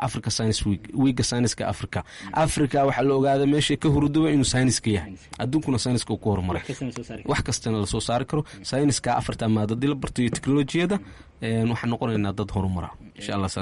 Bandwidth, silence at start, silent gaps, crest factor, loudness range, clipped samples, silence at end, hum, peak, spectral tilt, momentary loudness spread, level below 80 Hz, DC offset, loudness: 11.5 kHz; 0 s; none; 12 dB; 4 LU; under 0.1%; 0 s; none; -12 dBFS; -5.5 dB/octave; 10 LU; -44 dBFS; under 0.1%; -24 LUFS